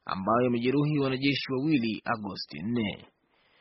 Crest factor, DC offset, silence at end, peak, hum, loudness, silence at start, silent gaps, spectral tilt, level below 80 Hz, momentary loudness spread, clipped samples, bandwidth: 16 dB; under 0.1%; 0.55 s; -12 dBFS; none; -28 LUFS; 0.05 s; none; -5 dB/octave; -64 dBFS; 9 LU; under 0.1%; 6 kHz